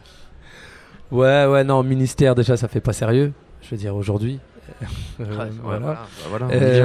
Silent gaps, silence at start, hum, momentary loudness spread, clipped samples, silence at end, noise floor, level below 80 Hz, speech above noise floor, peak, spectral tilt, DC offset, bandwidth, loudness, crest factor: none; 0.2 s; none; 16 LU; under 0.1%; 0 s; -43 dBFS; -42 dBFS; 25 dB; -2 dBFS; -7 dB/octave; under 0.1%; 13 kHz; -20 LUFS; 16 dB